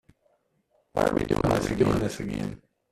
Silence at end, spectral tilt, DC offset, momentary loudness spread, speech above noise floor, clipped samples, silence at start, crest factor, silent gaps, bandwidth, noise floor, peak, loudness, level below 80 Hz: 0.35 s; -6.5 dB/octave; under 0.1%; 9 LU; 44 dB; under 0.1%; 0.95 s; 18 dB; none; 14.5 kHz; -70 dBFS; -8 dBFS; -27 LUFS; -44 dBFS